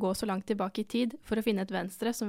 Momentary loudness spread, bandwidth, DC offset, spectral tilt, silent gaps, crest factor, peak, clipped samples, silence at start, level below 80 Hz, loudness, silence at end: 3 LU; 16.5 kHz; under 0.1%; -5 dB/octave; none; 16 dB; -16 dBFS; under 0.1%; 0 s; -60 dBFS; -32 LUFS; 0 s